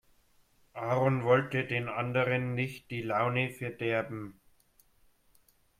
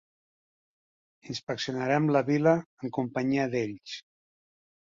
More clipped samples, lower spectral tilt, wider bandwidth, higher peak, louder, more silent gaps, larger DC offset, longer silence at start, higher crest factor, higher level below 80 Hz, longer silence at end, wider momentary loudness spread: neither; about the same, -7 dB/octave vs -6.5 dB/octave; first, 15 kHz vs 7.6 kHz; about the same, -12 dBFS vs -10 dBFS; second, -31 LUFS vs -28 LUFS; second, none vs 2.66-2.77 s; neither; second, 0.75 s vs 1.25 s; about the same, 20 dB vs 20 dB; about the same, -66 dBFS vs -70 dBFS; first, 1.5 s vs 0.85 s; about the same, 13 LU vs 15 LU